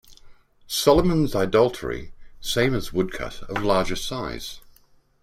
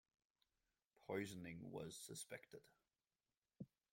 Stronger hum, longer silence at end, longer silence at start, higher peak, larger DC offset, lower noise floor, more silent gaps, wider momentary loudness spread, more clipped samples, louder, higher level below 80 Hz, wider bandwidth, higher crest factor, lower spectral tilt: neither; first, 0.65 s vs 0.25 s; second, 0.1 s vs 1 s; first, -4 dBFS vs -34 dBFS; neither; second, -56 dBFS vs under -90 dBFS; neither; about the same, 15 LU vs 15 LU; neither; first, -23 LUFS vs -53 LUFS; first, -40 dBFS vs -84 dBFS; about the same, 16 kHz vs 16.5 kHz; about the same, 20 dB vs 22 dB; about the same, -5 dB/octave vs -4.5 dB/octave